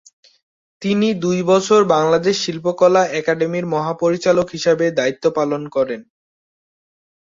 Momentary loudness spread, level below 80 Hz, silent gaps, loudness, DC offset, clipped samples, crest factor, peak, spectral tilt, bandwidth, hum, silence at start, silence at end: 7 LU; -58 dBFS; none; -17 LUFS; under 0.1%; under 0.1%; 16 dB; -2 dBFS; -5 dB/octave; 7.8 kHz; none; 0.8 s; 1.2 s